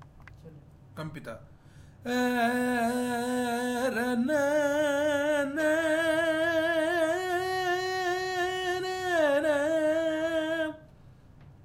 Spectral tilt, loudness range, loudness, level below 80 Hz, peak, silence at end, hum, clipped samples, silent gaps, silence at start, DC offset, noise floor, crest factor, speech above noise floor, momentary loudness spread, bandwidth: -4 dB/octave; 4 LU; -28 LUFS; -60 dBFS; -14 dBFS; 0.15 s; none; under 0.1%; none; 0 s; under 0.1%; -53 dBFS; 14 dB; 25 dB; 10 LU; 16 kHz